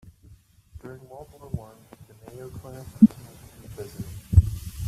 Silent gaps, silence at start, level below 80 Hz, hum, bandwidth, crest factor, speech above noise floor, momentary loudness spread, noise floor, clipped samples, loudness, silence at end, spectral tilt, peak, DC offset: none; 0.85 s; -36 dBFS; none; 14.5 kHz; 24 dB; 27 dB; 26 LU; -53 dBFS; under 0.1%; -23 LUFS; 0 s; -8.5 dB/octave; -4 dBFS; under 0.1%